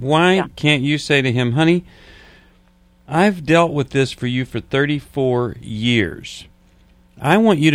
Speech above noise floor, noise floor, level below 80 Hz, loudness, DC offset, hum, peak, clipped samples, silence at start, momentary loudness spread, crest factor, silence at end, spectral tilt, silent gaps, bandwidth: 36 dB; -53 dBFS; -48 dBFS; -17 LUFS; under 0.1%; none; 0 dBFS; under 0.1%; 0 s; 9 LU; 18 dB; 0 s; -6 dB/octave; none; 13.5 kHz